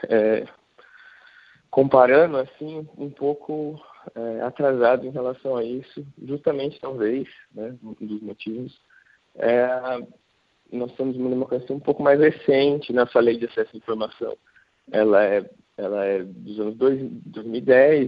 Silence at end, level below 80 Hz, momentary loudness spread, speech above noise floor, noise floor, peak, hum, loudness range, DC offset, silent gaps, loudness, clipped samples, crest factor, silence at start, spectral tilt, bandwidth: 0 s; -66 dBFS; 18 LU; 42 dB; -63 dBFS; -2 dBFS; none; 7 LU; under 0.1%; none; -22 LUFS; under 0.1%; 22 dB; 0 s; -9 dB/octave; 5.2 kHz